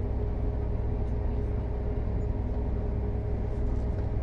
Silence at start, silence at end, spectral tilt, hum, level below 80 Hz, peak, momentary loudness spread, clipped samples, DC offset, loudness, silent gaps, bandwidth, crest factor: 0 s; 0 s; -10.5 dB/octave; none; -30 dBFS; -18 dBFS; 1 LU; under 0.1%; under 0.1%; -32 LUFS; none; 4.1 kHz; 10 dB